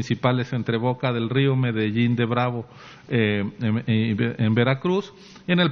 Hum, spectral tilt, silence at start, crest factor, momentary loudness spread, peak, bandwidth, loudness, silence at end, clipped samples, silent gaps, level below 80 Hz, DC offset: none; -5.5 dB/octave; 0 s; 18 dB; 6 LU; -4 dBFS; 6.6 kHz; -23 LUFS; 0 s; under 0.1%; none; -60 dBFS; under 0.1%